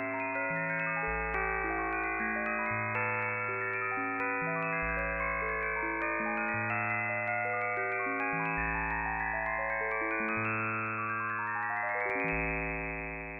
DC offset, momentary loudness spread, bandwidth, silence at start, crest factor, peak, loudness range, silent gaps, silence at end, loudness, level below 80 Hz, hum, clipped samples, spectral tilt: under 0.1%; 2 LU; 5.2 kHz; 0 s; 16 dB; -18 dBFS; 1 LU; none; 0 s; -32 LUFS; -50 dBFS; none; under 0.1%; -9.5 dB/octave